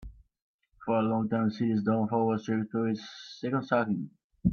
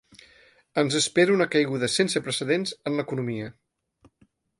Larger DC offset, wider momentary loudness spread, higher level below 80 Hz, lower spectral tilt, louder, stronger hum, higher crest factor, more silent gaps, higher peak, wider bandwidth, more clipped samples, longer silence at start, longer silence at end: neither; about the same, 10 LU vs 11 LU; first, -54 dBFS vs -66 dBFS; first, -8 dB/octave vs -4 dB/octave; second, -30 LUFS vs -24 LUFS; neither; about the same, 18 dB vs 20 dB; first, 0.42-0.59 s, 4.24-4.30 s vs none; second, -12 dBFS vs -6 dBFS; second, 6.8 kHz vs 11.5 kHz; neither; second, 0 s vs 0.75 s; second, 0 s vs 1.1 s